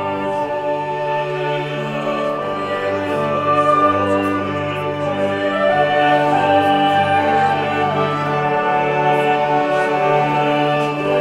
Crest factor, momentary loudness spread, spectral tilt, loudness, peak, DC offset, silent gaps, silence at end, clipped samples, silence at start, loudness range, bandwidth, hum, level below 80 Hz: 14 dB; 7 LU; -6.5 dB/octave; -17 LUFS; -2 dBFS; under 0.1%; none; 0 s; under 0.1%; 0 s; 3 LU; 12.5 kHz; none; -60 dBFS